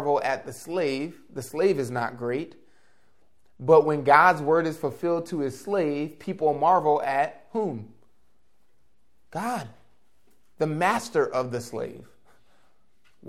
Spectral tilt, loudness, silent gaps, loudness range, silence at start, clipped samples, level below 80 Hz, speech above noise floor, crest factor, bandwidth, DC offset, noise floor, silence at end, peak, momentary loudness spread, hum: -6 dB/octave; -25 LUFS; none; 9 LU; 0 s; under 0.1%; -68 dBFS; 47 dB; 24 dB; 15.5 kHz; 0.2%; -72 dBFS; 0 s; -2 dBFS; 15 LU; none